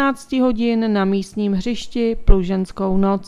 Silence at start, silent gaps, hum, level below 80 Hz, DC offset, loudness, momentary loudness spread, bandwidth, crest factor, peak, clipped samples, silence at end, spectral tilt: 0 s; none; none; -24 dBFS; under 0.1%; -20 LUFS; 4 LU; 11 kHz; 16 dB; 0 dBFS; under 0.1%; 0 s; -7 dB/octave